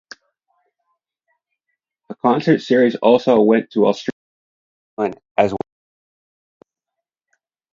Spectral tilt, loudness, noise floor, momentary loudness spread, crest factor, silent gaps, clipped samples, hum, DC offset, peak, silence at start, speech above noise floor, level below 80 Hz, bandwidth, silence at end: -7 dB/octave; -17 LUFS; -83 dBFS; 16 LU; 20 dB; 4.12-4.97 s, 5.31-5.35 s; under 0.1%; none; under 0.1%; 0 dBFS; 2.1 s; 68 dB; -62 dBFS; 7.6 kHz; 2.15 s